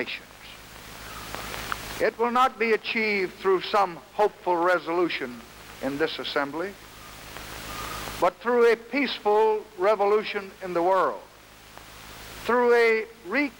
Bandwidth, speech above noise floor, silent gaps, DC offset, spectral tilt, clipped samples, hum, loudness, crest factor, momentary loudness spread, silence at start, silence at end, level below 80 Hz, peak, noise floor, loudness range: 20 kHz; 25 dB; none; under 0.1%; -4 dB/octave; under 0.1%; none; -25 LUFS; 16 dB; 20 LU; 0 s; 0.05 s; -54 dBFS; -10 dBFS; -49 dBFS; 5 LU